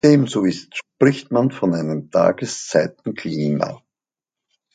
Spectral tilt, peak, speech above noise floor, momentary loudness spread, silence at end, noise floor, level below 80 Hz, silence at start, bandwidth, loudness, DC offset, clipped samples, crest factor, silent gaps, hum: -6 dB/octave; 0 dBFS; 71 dB; 11 LU; 1 s; -90 dBFS; -60 dBFS; 0.05 s; 9.4 kHz; -20 LUFS; under 0.1%; under 0.1%; 18 dB; none; none